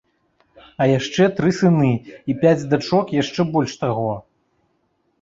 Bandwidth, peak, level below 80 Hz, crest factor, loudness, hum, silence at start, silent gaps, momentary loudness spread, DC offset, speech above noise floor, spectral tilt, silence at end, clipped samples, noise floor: 7.8 kHz; -2 dBFS; -54 dBFS; 18 dB; -19 LUFS; none; 0.8 s; none; 8 LU; under 0.1%; 48 dB; -6.5 dB/octave; 1 s; under 0.1%; -67 dBFS